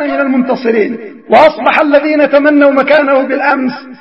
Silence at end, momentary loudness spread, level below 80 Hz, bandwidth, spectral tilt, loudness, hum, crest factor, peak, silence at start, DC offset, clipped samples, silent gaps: 0.05 s; 7 LU; -52 dBFS; 6.2 kHz; -6.5 dB/octave; -9 LUFS; none; 10 dB; 0 dBFS; 0 s; 0.3%; 0.4%; none